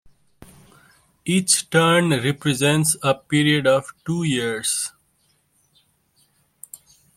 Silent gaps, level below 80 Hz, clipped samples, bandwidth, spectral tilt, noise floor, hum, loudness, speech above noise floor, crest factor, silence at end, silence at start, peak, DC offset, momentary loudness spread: none; -58 dBFS; under 0.1%; 16.5 kHz; -4 dB/octave; -65 dBFS; none; -19 LUFS; 45 dB; 20 dB; 2.3 s; 1.25 s; -2 dBFS; under 0.1%; 13 LU